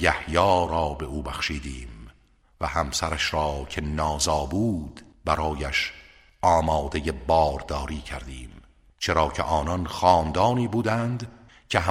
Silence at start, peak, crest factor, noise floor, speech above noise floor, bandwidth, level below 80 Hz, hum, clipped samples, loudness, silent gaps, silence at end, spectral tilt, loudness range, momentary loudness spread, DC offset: 0 s; -2 dBFS; 22 dB; -59 dBFS; 34 dB; 15.5 kHz; -38 dBFS; none; under 0.1%; -25 LUFS; none; 0 s; -4.5 dB/octave; 3 LU; 13 LU; under 0.1%